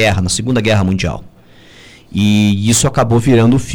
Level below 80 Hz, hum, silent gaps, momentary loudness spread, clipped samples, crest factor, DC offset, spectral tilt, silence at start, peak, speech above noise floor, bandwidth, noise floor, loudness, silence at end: -34 dBFS; none; none; 9 LU; under 0.1%; 12 dB; under 0.1%; -5 dB/octave; 0 s; 0 dBFS; 30 dB; 17.5 kHz; -42 dBFS; -13 LUFS; 0 s